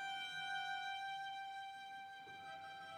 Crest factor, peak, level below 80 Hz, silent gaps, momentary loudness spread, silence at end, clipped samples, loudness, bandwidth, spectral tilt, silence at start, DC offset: 14 dB; -34 dBFS; under -90 dBFS; none; 9 LU; 0 s; under 0.1%; -47 LUFS; over 20 kHz; -0.5 dB/octave; 0 s; under 0.1%